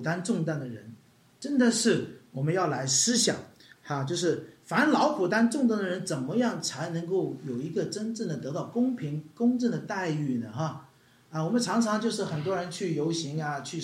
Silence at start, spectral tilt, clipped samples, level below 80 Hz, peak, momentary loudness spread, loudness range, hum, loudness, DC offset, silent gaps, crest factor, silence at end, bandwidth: 0 s; -4.5 dB/octave; under 0.1%; -74 dBFS; -12 dBFS; 11 LU; 4 LU; none; -28 LUFS; under 0.1%; none; 18 dB; 0 s; 13.5 kHz